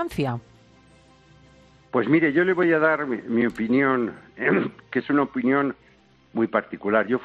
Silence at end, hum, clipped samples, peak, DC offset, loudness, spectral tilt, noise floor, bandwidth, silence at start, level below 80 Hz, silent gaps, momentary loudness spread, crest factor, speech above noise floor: 0 s; none; under 0.1%; -6 dBFS; under 0.1%; -23 LUFS; -8 dB/octave; -56 dBFS; 11.5 kHz; 0 s; -60 dBFS; none; 9 LU; 18 dB; 34 dB